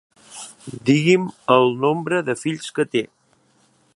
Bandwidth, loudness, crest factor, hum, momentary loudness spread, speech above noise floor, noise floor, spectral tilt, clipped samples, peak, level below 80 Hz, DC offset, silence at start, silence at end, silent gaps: 11.5 kHz; -20 LUFS; 20 dB; none; 20 LU; 41 dB; -60 dBFS; -5.5 dB/octave; under 0.1%; -2 dBFS; -66 dBFS; under 0.1%; 0.3 s; 0.9 s; none